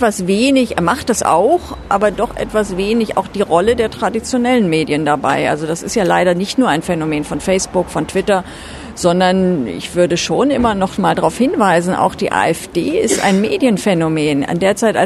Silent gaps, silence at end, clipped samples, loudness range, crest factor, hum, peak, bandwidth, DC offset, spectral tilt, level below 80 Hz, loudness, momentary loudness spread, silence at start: none; 0 s; under 0.1%; 2 LU; 14 dB; none; 0 dBFS; 13.5 kHz; under 0.1%; -5 dB/octave; -40 dBFS; -15 LUFS; 5 LU; 0 s